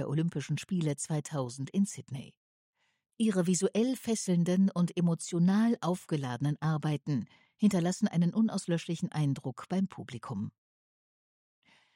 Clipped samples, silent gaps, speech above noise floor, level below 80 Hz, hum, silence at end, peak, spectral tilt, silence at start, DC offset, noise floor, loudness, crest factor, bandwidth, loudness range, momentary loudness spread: under 0.1%; 2.37-2.73 s; over 60 dB; -74 dBFS; none; 1.45 s; -16 dBFS; -6.5 dB/octave; 0 s; under 0.1%; under -90 dBFS; -31 LUFS; 16 dB; 16 kHz; 6 LU; 10 LU